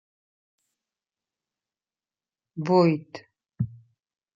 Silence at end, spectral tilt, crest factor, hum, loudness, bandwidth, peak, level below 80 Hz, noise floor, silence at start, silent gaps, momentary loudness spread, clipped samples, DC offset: 0.65 s; -8.5 dB/octave; 22 dB; none; -25 LUFS; 7.4 kHz; -8 dBFS; -66 dBFS; under -90 dBFS; 2.55 s; none; 23 LU; under 0.1%; under 0.1%